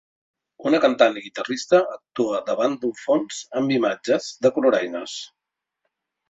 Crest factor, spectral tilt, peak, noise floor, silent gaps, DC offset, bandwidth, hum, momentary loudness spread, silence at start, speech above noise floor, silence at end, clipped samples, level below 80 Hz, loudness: 20 dB; -4.5 dB/octave; -2 dBFS; -84 dBFS; none; under 0.1%; 8 kHz; none; 11 LU; 0.6 s; 63 dB; 1.05 s; under 0.1%; -68 dBFS; -22 LUFS